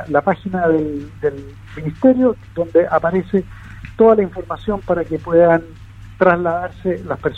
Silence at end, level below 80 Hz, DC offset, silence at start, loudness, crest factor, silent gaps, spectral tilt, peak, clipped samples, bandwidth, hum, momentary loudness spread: 0 s; -42 dBFS; under 0.1%; 0 s; -17 LUFS; 16 dB; none; -9 dB/octave; 0 dBFS; under 0.1%; 6.4 kHz; none; 14 LU